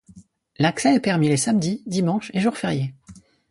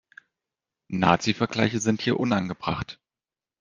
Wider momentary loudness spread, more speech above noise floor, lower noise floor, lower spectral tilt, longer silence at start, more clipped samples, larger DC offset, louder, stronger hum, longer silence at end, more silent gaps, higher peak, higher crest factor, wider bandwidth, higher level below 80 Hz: second, 7 LU vs 11 LU; second, 29 dB vs over 66 dB; second, -50 dBFS vs under -90 dBFS; about the same, -5.5 dB/octave vs -5 dB/octave; second, 0.15 s vs 0.9 s; neither; neither; first, -22 LUFS vs -25 LUFS; neither; second, 0.4 s vs 0.65 s; neither; second, -6 dBFS vs -2 dBFS; second, 16 dB vs 24 dB; first, 11.5 kHz vs 10 kHz; about the same, -58 dBFS vs -56 dBFS